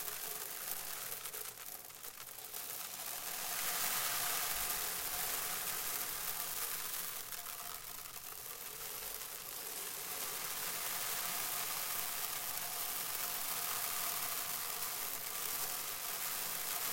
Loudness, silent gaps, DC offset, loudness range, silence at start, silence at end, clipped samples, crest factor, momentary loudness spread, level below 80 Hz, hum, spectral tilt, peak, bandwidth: -38 LUFS; none; under 0.1%; 6 LU; 0 s; 0 s; under 0.1%; 24 dB; 9 LU; -68 dBFS; none; 0.5 dB/octave; -16 dBFS; 17 kHz